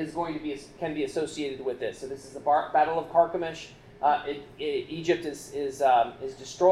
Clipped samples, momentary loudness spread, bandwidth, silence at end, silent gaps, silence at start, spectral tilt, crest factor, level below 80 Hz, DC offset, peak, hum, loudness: under 0.1%; 13 LU; 13 kHz; 0 s; none; 0 s; -4.5 dB/octave; 18 dB; -60 dBFS; under 0.1%; -8 dBFS; none; -28 LUFS